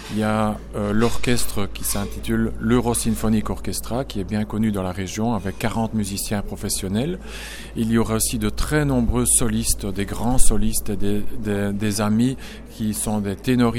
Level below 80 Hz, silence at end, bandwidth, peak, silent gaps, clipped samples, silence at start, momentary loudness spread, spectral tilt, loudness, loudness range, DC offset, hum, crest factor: -30 dBFS; 0 s; 17 kHz; 0 dBFS; none; under 0.1%; 0 s; 7 LU; -4.5 dB/octave; -22 LUFS; 4 LU; under 0.1%; none; 20 dB